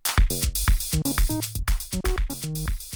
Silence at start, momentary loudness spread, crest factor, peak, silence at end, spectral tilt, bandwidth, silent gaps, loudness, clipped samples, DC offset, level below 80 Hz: 0.05 s; 6 LU; 12 dB; -10 dBFS; 0 s; -3.5 dB/octave; over 20 kHz; none; -26 LUFS; under 0.1%; under 0.1%; -26 dBFS